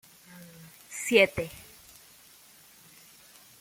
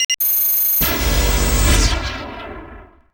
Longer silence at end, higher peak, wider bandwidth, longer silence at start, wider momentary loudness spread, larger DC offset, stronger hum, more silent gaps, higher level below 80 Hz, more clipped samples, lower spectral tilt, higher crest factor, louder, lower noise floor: first, 2 s vs 0.3 s; second, -8 dBFS vs -2 dBFS; second, 17 kHz vs over 20 kHz; first, 0.35 s vs 0 s; first, 28 LU vs 18 LU; neither; neither; second, none vs 0.05-0.09 s; second, -64 dBFS vs -22 dBFS; neither; about the same, -3 dB/octave vs -3 dB/octave; first, 26 dB vs 16 dB; second, -25 LUFS vs -15 LUFS; first, -56 dBFS vs -39 dBFS